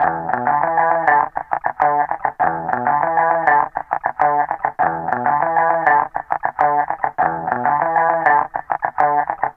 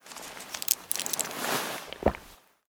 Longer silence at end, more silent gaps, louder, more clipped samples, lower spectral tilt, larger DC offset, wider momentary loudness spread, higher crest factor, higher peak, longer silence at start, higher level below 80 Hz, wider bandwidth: second, 0.05 s vs 0.35 s; neither; first, -18 LUFS vs -30 LUFS; neither; first, -8 dB/octave vs -2 dB/octave; neither; second, 7 LU vs 13 LU; second, 16 dB vs 32 dB; about the same, -2 dBFS vs -2 dBFS; about the same, 0 s vs 0.05 s; second, -56 dBFS vs -48 dBFS; second, 3.7 kHz vs over 20 kHz